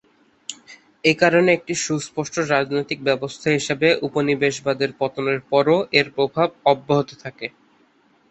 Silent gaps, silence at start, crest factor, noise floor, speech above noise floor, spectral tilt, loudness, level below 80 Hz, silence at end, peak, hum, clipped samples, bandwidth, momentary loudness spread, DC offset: none; 0.5 s; 18 dB; -58 dBFS; 38 dB; -4.5 dB/octave; -20 LUFS; -62 dBFS; 0.8 s; -2 dBFS; none; under 0.1%; 8.4 kHz; 15 LU; under 0.1%